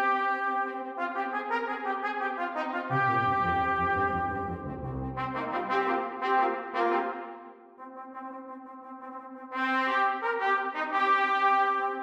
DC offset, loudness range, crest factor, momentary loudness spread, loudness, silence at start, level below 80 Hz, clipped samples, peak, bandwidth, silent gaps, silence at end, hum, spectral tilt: under 0.1%; 5 LU; 16 dB; 18 LU; -28 LUFS; 0 s; -56 dBFS; under 0.1%; -14 dBFS; 8 kHz; none; 0 s; none; -6.5 dB/octave